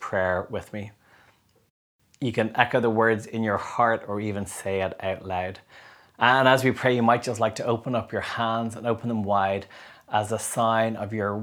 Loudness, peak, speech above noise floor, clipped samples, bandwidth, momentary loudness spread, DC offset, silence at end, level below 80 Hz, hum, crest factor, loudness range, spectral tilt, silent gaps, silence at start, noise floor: -25 LUFS; -2 dBFS; 36 dB; under 0.1%; over 20 kHz; 11 LU; under 0.1%; 0 s; -62 dBFS; none; 24 dB; 4 LU; -5 dB/octave; 1.70-1.99 s; 0 s; -61 dBFS